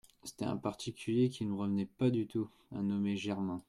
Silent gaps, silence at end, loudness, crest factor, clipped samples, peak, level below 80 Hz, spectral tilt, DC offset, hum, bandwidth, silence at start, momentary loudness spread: none; 0.1 s; -36 LUFS; 16 dB; under 0.1%; -20 dBFS; -70 dBFS; -7 dB/octave; under 0.1%; none; 13.5 kHz; 0.25 s; 8 LU